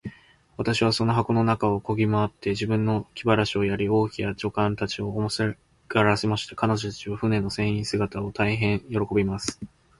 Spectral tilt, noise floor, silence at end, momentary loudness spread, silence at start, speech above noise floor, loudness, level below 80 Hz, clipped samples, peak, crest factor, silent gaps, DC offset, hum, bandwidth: -6 dB/octave; -45 dBFS; 0.35 s; 7 LU; 0.05 s; 21 dB; -25 LUFS; -48 dBFS; under 0.1%; -4 dBFS; 20 dB; none; under 0.1%; none; 11.5 kHz